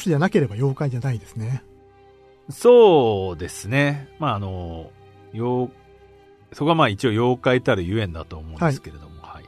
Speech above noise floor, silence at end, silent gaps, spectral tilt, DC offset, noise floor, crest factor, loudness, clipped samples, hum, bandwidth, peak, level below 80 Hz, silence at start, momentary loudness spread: 31 dB; 0.1 s; none; -6.5 dB/octave; under 0.1%; -51 dBFS; 18 dB; -20 LUFS; under 0.1%; none; 13.5 kHz; -4 dBFS; -48 dBFS; 0 s; 19 LU